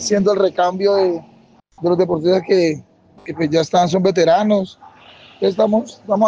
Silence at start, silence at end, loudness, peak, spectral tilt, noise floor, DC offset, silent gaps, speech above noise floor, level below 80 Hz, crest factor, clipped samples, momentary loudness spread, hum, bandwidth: 0 s; 0 s; -17 LUFS; -2 dBFS; -5.5 dB/octave; -44 dBFS; under 0.1%; none; 28 dB; -58 dBFS; 14 dB; under 0.1%; 9 LU; none; 9 kHz